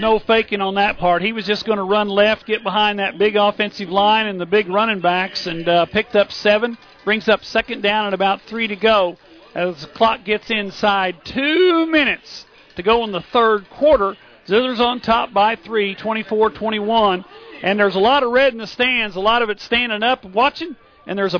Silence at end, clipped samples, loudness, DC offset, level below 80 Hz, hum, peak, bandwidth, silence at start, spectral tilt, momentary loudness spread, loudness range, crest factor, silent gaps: 0 s; under 0.1%; -17 LUFS; under 0.1%; -48 dBFS; none; -4 dBFS; 5.4 kHz; 0 s; -5.5 dB/octave; 8 LU; 2 LU; 14 dB; none